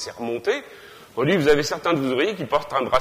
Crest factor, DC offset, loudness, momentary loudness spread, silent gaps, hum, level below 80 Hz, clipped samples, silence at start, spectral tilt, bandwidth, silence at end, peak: 16 dB; under 0.1%; -22 LUFS; 10 LU; none; none; -50 dBFS; under 0.1%; 0 s; -5 dB/octave; 15.5 kHz; 0 s; -6 dBFS